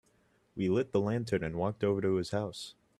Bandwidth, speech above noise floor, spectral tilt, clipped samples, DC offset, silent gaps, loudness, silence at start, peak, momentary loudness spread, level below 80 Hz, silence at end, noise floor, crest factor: 12.5 kHz; 38 dB; -7 dB/octave; under 0.1%; under 0.1%; none; -32 LUFS; 0.55 s; -16 dBFS; 9 LU; -62 dBFS; 0.25 s; -70 dBFS; 16 dB